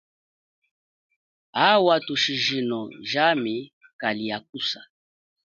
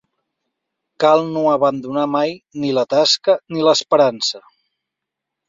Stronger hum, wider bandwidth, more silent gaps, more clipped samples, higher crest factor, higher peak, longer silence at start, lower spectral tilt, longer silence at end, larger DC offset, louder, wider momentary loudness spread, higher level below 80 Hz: neither; about the same, 7.6 kHz vs 7.8 kHz; first, 3.73-3.81 s, 3.93-3.99 s, 4.49-4.53 s vs none; neither; first, 22 dB vs 16 dB; about the same, -4 dBFS vs -2 dBFS; first, 1.55 s vs 1 s; about the same, -4 dB/octave vs -4 dB/octave; second, 0.7 s vs 1.1 s; neither; second, -23 LUFS vs -17 LUFS; first, 12 LU vs 8 LU; second, -72 dBFS vs -66 dBFS